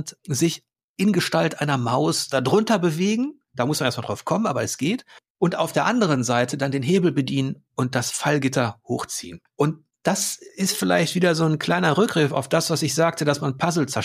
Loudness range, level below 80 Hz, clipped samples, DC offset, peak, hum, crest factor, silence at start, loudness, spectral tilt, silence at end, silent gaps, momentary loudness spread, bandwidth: 3 LU; -64 dBFS; under 0.1%; under 0.1%; -6 dBFS; none; 16 dB; 0 s; -22 LUFS; -4.5 dB/octave; 0 s; 0.84-0.95 s, 5.30-5.35 s; 8 LU; 15.5 kHz